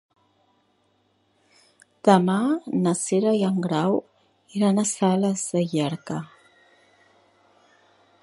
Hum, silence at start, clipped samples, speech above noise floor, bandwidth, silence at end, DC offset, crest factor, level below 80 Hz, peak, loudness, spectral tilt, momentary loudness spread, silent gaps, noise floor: none; 2.05 s; under 0.1%; 45 dB; 11.5 kHz; 1.95 s; under 0.1%; 22 dB; -70 dBFS; -2 dBFS; -23 LUFS; -5.5 dB/octave; 12 LU; none; -66 dBFS